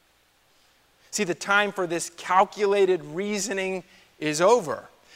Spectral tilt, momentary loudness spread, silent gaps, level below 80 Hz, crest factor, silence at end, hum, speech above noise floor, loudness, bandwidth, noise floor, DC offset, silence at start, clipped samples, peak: -3.5 dB/octave; 11 LU; none; -72 dBFS; 20 dB; 0.3 s; none; 39 dB; -24 LUFS; 16 kHz; -63 dBFS; under 0.1%; 1.1 s; under 0.1%; -6 dBFS